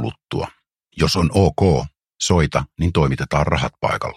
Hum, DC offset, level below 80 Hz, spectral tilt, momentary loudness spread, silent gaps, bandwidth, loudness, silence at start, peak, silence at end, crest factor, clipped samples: none; under 0.1%; -34 dBFS; -5.5 dB/octave; 11 LU; none; 13.5 kHz; -19 LUFS; 0 s; 0 dBFS; 0.05 s; 18 dB; under 0.1%